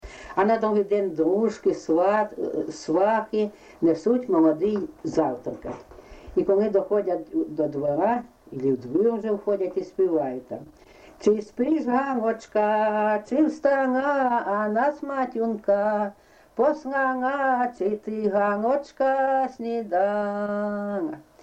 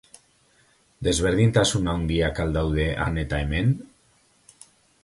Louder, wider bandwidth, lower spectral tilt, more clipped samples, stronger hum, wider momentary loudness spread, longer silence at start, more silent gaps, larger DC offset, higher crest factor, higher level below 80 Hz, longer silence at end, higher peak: about the same, -24 LUFS vs -23 LUFS; second, 8.6 kHz vs 11.5 kHz; first, -7 dB/octave vs -5.5 dB/octave; neither; neither; about the same, 8 LU vs 7 LU; second, 0.05 s vs 1 s; neither; neither; about the same, 16 dB vs 20 dB; second, -58 dBFS vs -36 dBFS; second, 0.2 s vs 1.2 s; second, -8 dBFS vs -4 dBFS